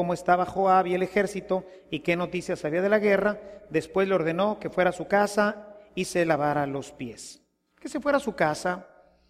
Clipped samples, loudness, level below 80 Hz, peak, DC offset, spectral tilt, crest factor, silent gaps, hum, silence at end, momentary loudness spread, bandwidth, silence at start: under 0.1%; -26 LUFS; -60 dBFS; -8 dBFS; under 0.1%; -5.5 dB/octave; 18 dB; none; none; 0.45 s; 15 LU; 15 kHz; 0 s